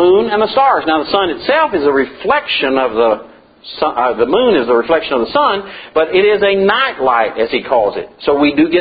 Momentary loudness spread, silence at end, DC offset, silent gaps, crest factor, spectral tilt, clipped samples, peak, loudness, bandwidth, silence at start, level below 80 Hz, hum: 6 LU; 0 s; under 0.1%; none; 12 dB; -9 dB/octave; under 0.1%; 0 dBFS; -13 LUFS; 5 kHz; 0 s; -48 dBFS; none